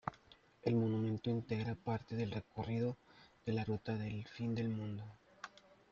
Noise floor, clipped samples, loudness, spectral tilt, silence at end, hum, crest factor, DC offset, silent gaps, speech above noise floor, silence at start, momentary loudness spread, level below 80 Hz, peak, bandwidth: -66 dBFS; under 0.1%; -40 LUFS; -8.5 dB/octave; 0.45 s; none; 22 dB; under 0.1%; none; 27 dB; 0.05 s; 17 LU; -68 dBFS; -18 dBFS; 7 kHz